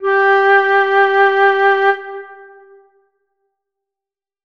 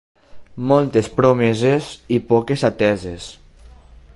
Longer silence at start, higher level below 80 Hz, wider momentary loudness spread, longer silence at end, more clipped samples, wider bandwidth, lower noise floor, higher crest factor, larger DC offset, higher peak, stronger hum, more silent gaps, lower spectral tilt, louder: second, 0 s vs 0.35 s; second, -68 dBFS vs -46 dBFS; about the same, 11 LU vs 12 LU; first, 2.1 s vs 0.85 s; neither; second, 6.2 kHz vs 11.5 kHz; first, -89 dBFS vs -44 dBFS; about the same, 14 dB vs 18 dB; neither; about the same, -2 dBFS vs -2 dBFS; neither; neither; second, -2.5 dB/octave vs -6.5 dB/octave; first, -12 LUFS vs -18 LUFS